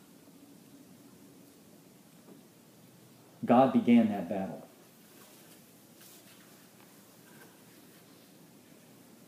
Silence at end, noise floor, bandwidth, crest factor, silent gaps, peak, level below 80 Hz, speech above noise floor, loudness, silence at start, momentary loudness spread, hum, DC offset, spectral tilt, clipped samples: 4.65 s; -58 dBFS; 15.5 kHz; 24 dB; none; -10 dBFS; -84 dBFS; 32 dB; -27 LUFS; 3.4 s; 30 LU; none; under 0.1%; -7 dB/octave; under 0.1%